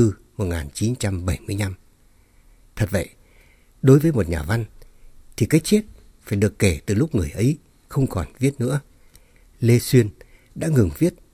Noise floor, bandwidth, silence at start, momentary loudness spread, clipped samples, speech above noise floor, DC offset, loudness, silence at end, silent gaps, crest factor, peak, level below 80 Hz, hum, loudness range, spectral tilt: -54 dBFS; 17.5 kHz; 0 s; 12 LU; under 0.1%; 35 dB; under 0.1%; -22 LUFS; 0.2 s; none; 20 dB; -2 dBFS; -42 dBFS; none; 5 LU; -6.5 dB/octave